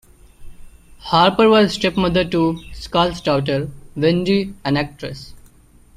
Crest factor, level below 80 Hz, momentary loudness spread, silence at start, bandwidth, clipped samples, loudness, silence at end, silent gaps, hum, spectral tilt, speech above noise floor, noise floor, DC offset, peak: 18 dB; -42 dBFS; 17 LU; 0.4 s; 14 kHz; under 0.1%; -17 LUFS; 0.6 s; none; none; -6 dB/octave; 31 dB; -48 dBFS; under 0.1%; -2 dBFS